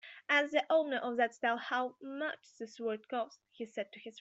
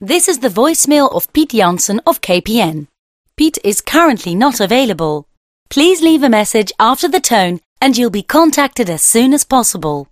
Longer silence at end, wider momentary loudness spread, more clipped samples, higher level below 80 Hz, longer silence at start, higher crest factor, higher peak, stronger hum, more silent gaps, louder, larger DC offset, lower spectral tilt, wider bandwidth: about the same, 0 s vs 0.05 s; first, 14 LU vs 6 LU; neither; second, -88 dBFS vs -44 dBFS; about the same, 0.05 s vs 0 s; first, 20 dB vs 12 dB; second, -14 dBFS vs 0 dBFS; neither; second, none vs 2.99-3.24 s, 5.37-5.66 s, 7.66-7.76 s; second, -35 LUFS vs -12 LUFS; neither; about the same, -3 dB/octave vs -3 dB/octave; second, 8 kHz vs 16 kHz